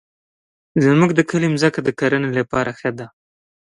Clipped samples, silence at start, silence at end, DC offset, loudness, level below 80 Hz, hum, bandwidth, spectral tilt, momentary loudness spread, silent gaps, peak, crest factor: under 0.1%; 0.75 s; 0.7 s; under 0.1%; -18 LUFS; -54 dBFS; none; 11 kHz; -6.5 dB/octave; 11 LU; none; -2 dBFS; 18 dB